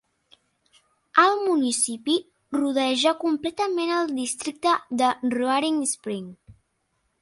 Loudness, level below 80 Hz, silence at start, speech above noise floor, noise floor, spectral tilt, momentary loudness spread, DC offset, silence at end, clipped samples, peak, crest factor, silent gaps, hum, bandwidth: -23 LUFS; -68 dBFS; 1.15 s; 50 dB; -73 dBFS; -2.5 dB/octave; 9 LU; under 0.1%; 0.7 s; under 0.1%; -4 dBFS; 20 dB; none; none; 11.5 kHz